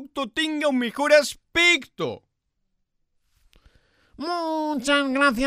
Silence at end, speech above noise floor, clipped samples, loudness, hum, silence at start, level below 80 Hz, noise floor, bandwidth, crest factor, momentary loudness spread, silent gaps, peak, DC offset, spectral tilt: 0 s; 52 dB; under 0.1%; -22 LUFS; none; 0 s; -54 dBFS; -74 dBFS; 15.5 kHz; 20 dB; 13 LU; none; -4 dBFS; under 0.1%; -2.5 dB/octave